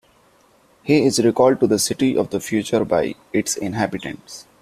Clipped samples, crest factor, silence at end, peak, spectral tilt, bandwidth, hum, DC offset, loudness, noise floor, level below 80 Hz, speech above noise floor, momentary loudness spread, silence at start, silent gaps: under 0.1%; 18 dB; 0.2 s; -2 dBFS; -4.5 dB/octave; 15.5 kHz; none; under 0.1%; -19 LUFS; -55 dBFS; -54 dBFS; 37 dB; 15 LU; 0.85 s; none